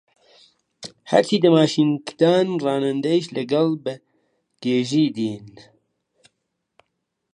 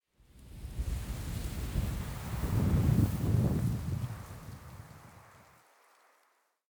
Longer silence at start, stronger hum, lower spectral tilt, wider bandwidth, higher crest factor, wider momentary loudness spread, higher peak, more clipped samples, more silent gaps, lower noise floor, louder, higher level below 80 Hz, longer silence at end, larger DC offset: first, 0.8 s vs 0.35 s; neither; about the same, -6 dB/octave vs -7 dB/octave; second, 10 kHz vs over 20 kHz; about the same, 20 dB vs 18 dB; second, 18 LU vs 22 LU; first, -2 dBFS vs -16 dBFS; neither; neither; first, -77 dBFS vs -73 dBFS; first, -20 LUFS vs -33 LUFS; second, -70 dBFS vs -42 dBFS; first, 1.85 s vs 1.3 s; neither